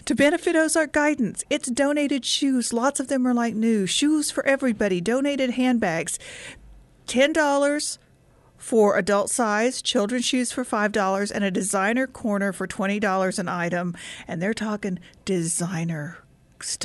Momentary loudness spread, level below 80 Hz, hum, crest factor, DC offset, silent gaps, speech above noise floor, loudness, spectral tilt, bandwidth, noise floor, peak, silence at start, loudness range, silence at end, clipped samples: 10 LU; -58 dBFS; none; 16 dB; under 0.1%; none; 33 dB; -23 LUFS; -4 dB/octave; 12 kHz; -56 dBFS; -8 dBFS; 0.05 s; 4 LU; 0 s; under 0.1%